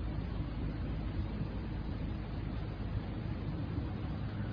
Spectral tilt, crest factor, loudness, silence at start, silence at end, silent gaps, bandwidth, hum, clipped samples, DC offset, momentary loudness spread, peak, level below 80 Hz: -7.5 dB/octave; 14 dB; -40 LUFS; 0 s; 0 s; none; 5.2 kHz; none; under 0.1%; under 0.1%; 2 LU; -24 dBFS; -42 dBFS